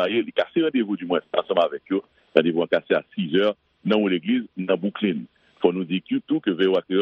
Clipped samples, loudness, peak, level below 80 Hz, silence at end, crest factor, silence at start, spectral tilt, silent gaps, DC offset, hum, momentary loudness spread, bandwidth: under 0.1%; -23 LUFS; 0 dBFS; -70 dBFS; 0 s; 22 dB; 0 s; -8 dB/octave; none; under 0.1%; none; 5 LU; 6 kHz